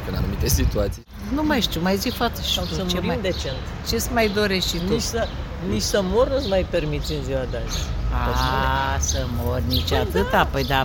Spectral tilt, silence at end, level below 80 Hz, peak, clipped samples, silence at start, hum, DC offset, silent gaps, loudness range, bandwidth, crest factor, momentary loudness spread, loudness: -4.5 dB/octave; 0 s; -28 dBFS; -4 dBFS; under 0.1%; 0 s; none; under 0.1%; none; 2 LU; 17 kHz; 18 dB; 7 LU; -23 LUFS